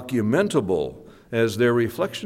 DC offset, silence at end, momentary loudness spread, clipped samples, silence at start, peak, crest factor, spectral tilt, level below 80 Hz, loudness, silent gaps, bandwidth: under 0.1%; 0 s; 7 LU; under 0.1%; 0 s; -8 dBFS; 16 dB; -6 dB/octave; -56 dBFS; -23 LUFS; none; 16 kHz